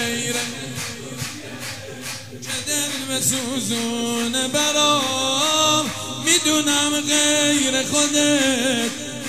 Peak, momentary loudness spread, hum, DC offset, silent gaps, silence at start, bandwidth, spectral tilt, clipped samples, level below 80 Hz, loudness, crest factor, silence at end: 0 dBFS; 14 LU; none; 0.5%; none; 0 s; 16 kHz; -1.5 dB/octave; under 0.1%; -58 dBFS; -19 LUFS; 20 dB; 0 s